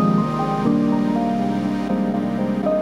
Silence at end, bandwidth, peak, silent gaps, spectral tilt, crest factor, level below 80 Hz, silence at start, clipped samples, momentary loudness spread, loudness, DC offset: 0 s; 11.5 kHz; -6 dBFS; none; -8.5 dB/octave; 14 dB; -46 dBFS; 0 s; under 0.1%; 3 LU; -20 LUFS; under 0.1%